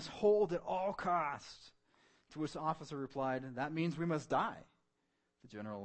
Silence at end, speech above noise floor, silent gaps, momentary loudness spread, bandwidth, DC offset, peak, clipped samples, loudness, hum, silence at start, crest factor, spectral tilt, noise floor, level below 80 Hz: 0 s; 45 dB; none; 19 LU; 8.4 kHz; under 0.1%; -22 dBFS; under 0.1%; -38 LUFS; none; 0 s; 18 dB; -6.5 dB/octave; -82 dBFS; -70 dBFS